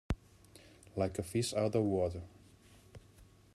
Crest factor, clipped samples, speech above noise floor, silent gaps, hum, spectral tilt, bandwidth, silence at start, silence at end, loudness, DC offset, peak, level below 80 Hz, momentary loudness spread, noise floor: 18 dB; under 0.1%; 27 dB; none; none; -6 dB/octave; 13.5 kHz; 0.1 s; 0.3 s; -36 LUFS; under 0.1%; -20 dBFS; -54 dBFS; 25 LU; -61 dBFS